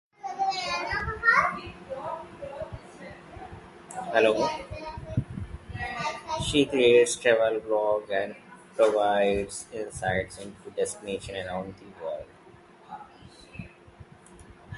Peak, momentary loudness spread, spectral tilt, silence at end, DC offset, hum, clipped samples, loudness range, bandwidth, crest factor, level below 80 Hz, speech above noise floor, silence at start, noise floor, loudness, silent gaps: -6 dBFS; 23 LU; -4 dB/octave; 0 s; under 0.1%; none; under 0.1%; 12 LU; 11.5 kHz; 22 dB; -50 dBFS; 27 dB; 0.25 s; -53 dBFS; -27 LUFS; none